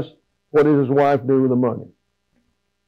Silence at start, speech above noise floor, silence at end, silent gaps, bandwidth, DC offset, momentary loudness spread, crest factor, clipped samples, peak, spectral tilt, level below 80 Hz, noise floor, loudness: 0 s; 52 dB; 1.05 s; none; 6.4 kHz; under 0.1%; 11 LU; 12 dB; under 0.1%; -8 dBFS; -9.5 dB/octave; -64 dBFS; -68 dBFS; -18 LUFS